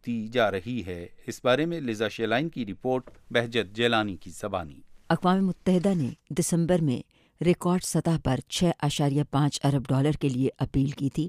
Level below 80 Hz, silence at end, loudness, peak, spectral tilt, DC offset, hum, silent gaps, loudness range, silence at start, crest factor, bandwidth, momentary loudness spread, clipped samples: -50 dBFS; 0 s; -27 LUFS; -8 dBFS; -5.5 dB/octave; under 0.1%; none; none; 3 LU; 0.05 s; 18 dB; 15.5 kHz; 9 LU; under 0.1%